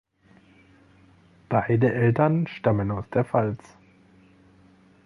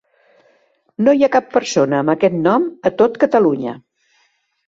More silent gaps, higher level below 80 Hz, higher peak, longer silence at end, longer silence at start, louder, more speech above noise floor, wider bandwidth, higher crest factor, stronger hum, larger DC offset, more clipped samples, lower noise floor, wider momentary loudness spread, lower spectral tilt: neither; first, -54 dBFS vs -60 dBFS; second, -6 dBFS vs -2 dBFS; first, 1.5 s vs 0.9 s; first, 1.5 s vs 1 s; second, -24 LUFS vs -15 LUFS; second, 34 dB vs 47 dB; second, 6.4 kHz vs 7.8 kHz; about the same, 20 dB vs 16 dB; neither; neither; neither; second, -57 dBFS vs -62 dBFS; second, 6 LU vs 10 LU; first, -9.5 dB/octave vs -6 dB/octave